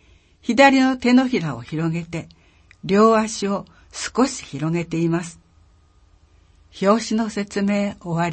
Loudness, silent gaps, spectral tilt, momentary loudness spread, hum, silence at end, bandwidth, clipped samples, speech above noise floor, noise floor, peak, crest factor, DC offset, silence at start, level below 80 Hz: -20 LUFS; none; -5.5 dB/octave; 15 LU; none; 0 s; 8.8 kHz; under 0.1%; 35 dB; -55 dBFS; 0 dBFS; 20 dB; under 0.1%; 0.45 s; -54 dBFS